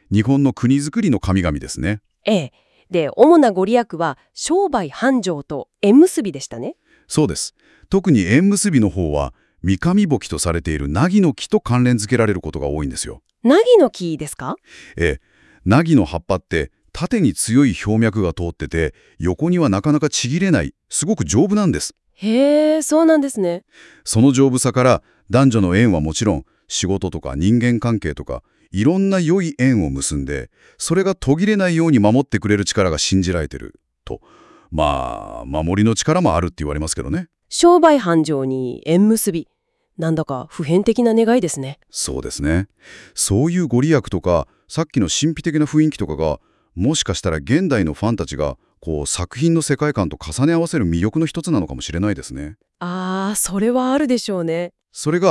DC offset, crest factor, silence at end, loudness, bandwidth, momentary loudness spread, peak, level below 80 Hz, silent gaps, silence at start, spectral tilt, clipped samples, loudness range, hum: under 0.1%; 18 dB; 0 s; -18 LUFS; 12 kHz; 13 LU; 0 dBFS; -40 dBFS; none; 0.1 s; -5.5 dB/octave; under 0.1%; 4 LU; none